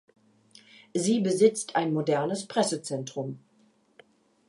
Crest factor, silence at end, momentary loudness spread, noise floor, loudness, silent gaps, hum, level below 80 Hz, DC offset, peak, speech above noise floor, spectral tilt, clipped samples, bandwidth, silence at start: 20 dB; 1.1 s; 13 LU; -64 dBFS; -27 LUFS; none; none; -80 dBFS; under 0.1%; -8 dBFS; 38 dB; -5 dB/octave; under 0.1%; 11.5 kHz; 0.95 s